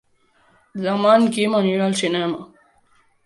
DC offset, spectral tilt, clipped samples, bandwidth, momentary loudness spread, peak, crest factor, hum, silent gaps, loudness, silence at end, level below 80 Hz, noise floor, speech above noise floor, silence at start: under 0.1%; -5 dB/octave; under 0.1%; 11.5 kHz; 13 LU; -2 dBFS; 18 dB; none; none; -19 LUFS; 0.8 s; -66 dBFS; -59 dBFS; 41 dB; 0.75 s